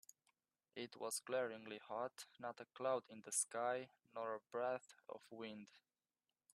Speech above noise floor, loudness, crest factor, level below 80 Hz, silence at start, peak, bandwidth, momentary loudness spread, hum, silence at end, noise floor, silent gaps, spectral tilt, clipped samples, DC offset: over 43 dB; -46 LUFS; 22 dB; under -90 dBFS; 0.75 s; -24 dBFS; 14 kHz; 14 LU; none; 0.75 s; under -90 dBFS; none; -2 dB/octave; under 0.1%; under 0.1%